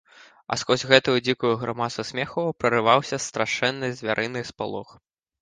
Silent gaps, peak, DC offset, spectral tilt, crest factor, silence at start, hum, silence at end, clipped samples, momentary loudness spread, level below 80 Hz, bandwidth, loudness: none; 0 dBFS; under 0.1%; -4 dB/octave; 24 dB; 0.5 s; none; 0.6 s; under 0.1%; 12 LU; -60 dBFS; 10 kHz; -23 LUFS